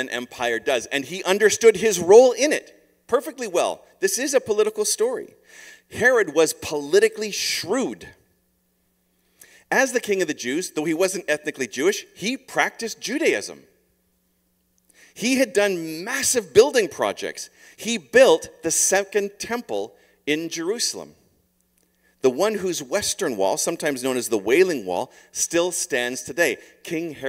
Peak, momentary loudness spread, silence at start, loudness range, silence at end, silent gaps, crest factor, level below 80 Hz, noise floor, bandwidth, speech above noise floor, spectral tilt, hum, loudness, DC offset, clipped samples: 0 dBFS; 12 LU; 0 s; 7 LU; 0 s; none; 22 dB; -62 dBFS; -67 dBFS; 16 kHz; 46 dB; -2.5 dB/octave; none; -21 LUFS; under 0.1%; under 0.1%